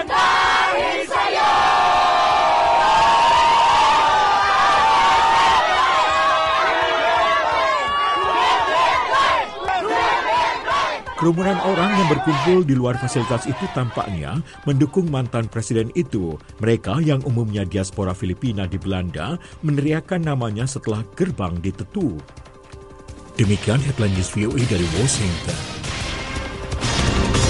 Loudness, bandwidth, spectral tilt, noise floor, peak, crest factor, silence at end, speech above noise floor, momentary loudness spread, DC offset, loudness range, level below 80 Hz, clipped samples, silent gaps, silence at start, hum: -18 LUFS; 11.5 kHz; -4.5 dB/octave; -40 dBFS; -4 dBFS; 14 dB; 0 s; 20 dB; 11 LU; under 0.1%; 9 LU; -38 dBFS; under 0.1%; none; 0 s; none